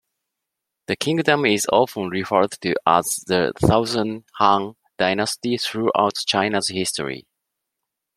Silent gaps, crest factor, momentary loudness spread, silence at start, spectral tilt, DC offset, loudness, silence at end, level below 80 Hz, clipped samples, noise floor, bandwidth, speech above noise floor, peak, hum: none; 20 dB; 9 LU; 0.9 s; -4 dB/octave; under 0.1%; -20 LUFS; 0.95 s; -50 dBFS; under 0.1%; -82 dBFS; 16 kHz; 62 dB; -2 dBFS; none